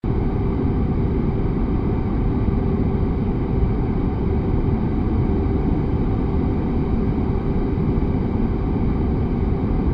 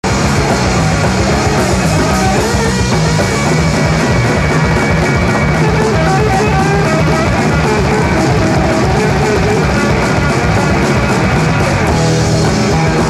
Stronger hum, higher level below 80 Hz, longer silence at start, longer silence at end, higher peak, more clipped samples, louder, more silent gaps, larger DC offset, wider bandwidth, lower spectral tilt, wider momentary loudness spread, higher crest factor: neither; about the same, -24 dBFS vs -22 dBFS; about the same, 0.05 s vs 0.05 s; about the same, 0 s vs 0 s; second, -8 dBFS vs 0 dBFS; neither; second, -22 LUFS vs -11 LUFS; neither; neither; second, 5.2 kHz vs 13.5 kHz; first, -11.5 dB/octave vs -5.5 dB/octave; about the same, 1 LU vs 1 LU; about the same, 12 dB vs 10 dB